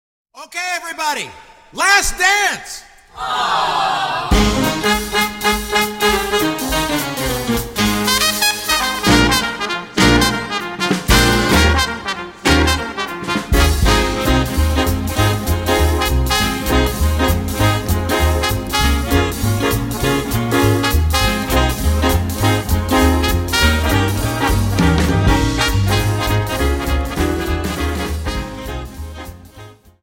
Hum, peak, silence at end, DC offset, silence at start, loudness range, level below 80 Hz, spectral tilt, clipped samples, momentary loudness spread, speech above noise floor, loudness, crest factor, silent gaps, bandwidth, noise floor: none; 0 dBFS; 0.3 s; under 0.1%; 0.35 s; 3 LU; -22 dBFS; -4 dB/octave; under 0.1%; 9 LU; 23 dB; -16 LUFS; 16 dB; none; 17 kHz; -40 dBFS